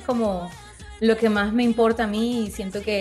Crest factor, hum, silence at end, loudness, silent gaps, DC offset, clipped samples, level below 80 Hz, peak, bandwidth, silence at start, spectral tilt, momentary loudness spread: 14 dB; none; 0 s; -22 LUFS; none; under 0.1%; under 0.1%; -46 dBFS; -8 dBFS; 12.5 kHz; 0 s; -5.5 dB/octave; 14 LU